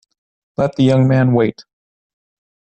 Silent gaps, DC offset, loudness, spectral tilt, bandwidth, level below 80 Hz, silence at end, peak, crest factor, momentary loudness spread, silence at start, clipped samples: none; under 0.1%; -15 LUFS; -8.5 dB/octave; 8.4 kHz; -52 dBFS; 1 s; -4 dBFS; 14 dB; 8 LU; 0.6 s; under 0.1%